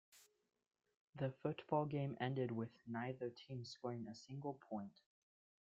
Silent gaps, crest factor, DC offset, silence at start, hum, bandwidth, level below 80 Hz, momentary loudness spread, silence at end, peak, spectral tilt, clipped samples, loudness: 1.00-1.13 s; 22 dB; under 0.1%; 0.15 s; none; 8.8 kHz; -82 dBFS; 10 LU; 0.75 s; -24 dBFS; -7.5 dB/octave; under 0.1%; -46 LUFS